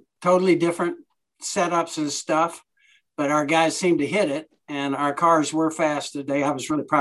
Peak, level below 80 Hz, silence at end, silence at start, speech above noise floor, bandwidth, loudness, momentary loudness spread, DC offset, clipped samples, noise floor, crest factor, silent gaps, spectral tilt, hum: -6 dBFS; -70 dBFS; 0 s; 0.2 s; 40 dB; 12.5 kHz; -22 LUFS; 9 LU; under 0.1%; under 0.1%; -61 dBFS; 16 dB; none; -4.5 dB/octave; none